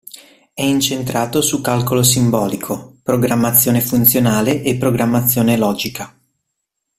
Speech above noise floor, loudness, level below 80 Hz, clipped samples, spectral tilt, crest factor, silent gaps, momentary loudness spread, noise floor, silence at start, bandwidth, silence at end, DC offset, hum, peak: 60 dB; -15 LUFS; -48 dBFS; under 0.1%; -4.5 dB/octave; 16 dB; none; 12 LU; -75 dBFS; 0.15 s; 16 kHz; 0.9 s; under 0.1%; none; 0 dBFS